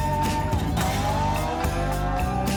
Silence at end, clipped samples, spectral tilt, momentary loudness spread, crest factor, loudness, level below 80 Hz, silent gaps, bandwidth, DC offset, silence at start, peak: 0 s; under 0.1%; -5.5 dB/octave; 2 LU; 10 dB; -25 LUFS; -30 dBFS; none; over 20 kHz; under 0.1%; 0 s; -14 dBFS